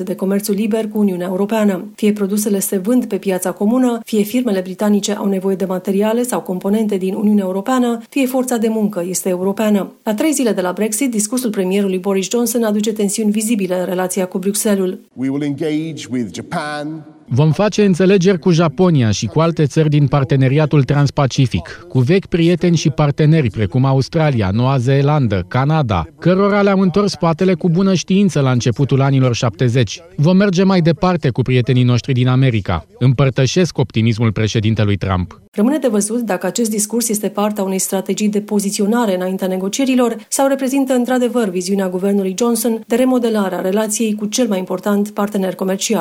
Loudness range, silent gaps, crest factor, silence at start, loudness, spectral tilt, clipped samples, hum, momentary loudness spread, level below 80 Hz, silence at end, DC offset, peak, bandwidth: 3 LU; 35.48-35.52 s; 14 dB; 0 s; -16 LUFS; -6 dB/octave; under 0.1%; none; 6 LU; -46 dBFS; 0 s; under 0.1%; -2 dBFS; 16.5 kHz